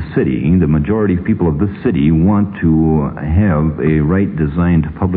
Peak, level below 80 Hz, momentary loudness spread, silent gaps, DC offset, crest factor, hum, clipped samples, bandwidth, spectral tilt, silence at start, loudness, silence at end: -2 dBFS; -28 dBFS; 4 LU; none; under 0.1%; 12 dB; none; under 0.1%; 4 kHz; -13 dB/octave; 0 s; -14 LUFS; 0 s